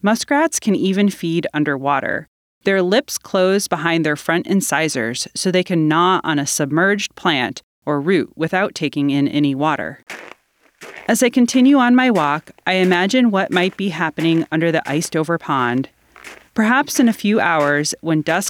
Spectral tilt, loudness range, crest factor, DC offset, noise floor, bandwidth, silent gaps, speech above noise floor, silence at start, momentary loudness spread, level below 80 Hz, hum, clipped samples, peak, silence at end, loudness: -4.5 dB/octave; 4 LU; 18 dB; under 0.1%; -54 dBFS; 17 kHz; 2.28-2.61 s, 7.63-7.82 s; 37 dB; 0.05 s; 7 LU; -62 dBFS; none; under 0.1%; 0 dBFS; 0 s; -17 LUFS